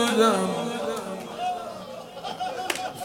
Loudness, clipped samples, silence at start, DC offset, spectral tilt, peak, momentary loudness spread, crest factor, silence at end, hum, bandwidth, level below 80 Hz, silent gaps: -27 LUFS; under 0.1%; 0 s; under 0.1%; -4 dB/octave; -6 dBFS; 16 LU; 20 dB; 0 s; none; 17.5 kHz; -66 dBFS; none